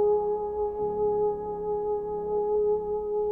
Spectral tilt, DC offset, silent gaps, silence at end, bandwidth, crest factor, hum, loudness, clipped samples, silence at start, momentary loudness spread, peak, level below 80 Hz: -11 dB/octave; under 0.1%; none; 0 s; 1.8 kHz; 10 dB; none; -28 LUFS; under 0.1%; 0 s; 5 LU; -18 dBFS; -52 dBFS